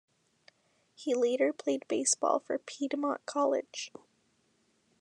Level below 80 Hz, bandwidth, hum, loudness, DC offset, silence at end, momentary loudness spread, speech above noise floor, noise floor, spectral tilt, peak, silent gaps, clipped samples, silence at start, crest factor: under -90 dBFS; 11 kHz; none; -31 LUFS; under 0.1%; 1.1 s; 13 LU; 41 dB; -72 dBFS; -1.5 dB/octave; -14 dBFS; none; under 0.1%; 1 s; 20 dB